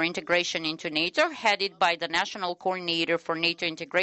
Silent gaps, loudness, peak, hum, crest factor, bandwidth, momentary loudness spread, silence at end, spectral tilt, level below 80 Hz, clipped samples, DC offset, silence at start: none; -26 LUFS; -10 dBFS; none; 18 dB; 8.4 kHz; 5 LU; 0 s; -3 dB/octave; -68 dBFS; under 0.1%; under 0.1%; 0 s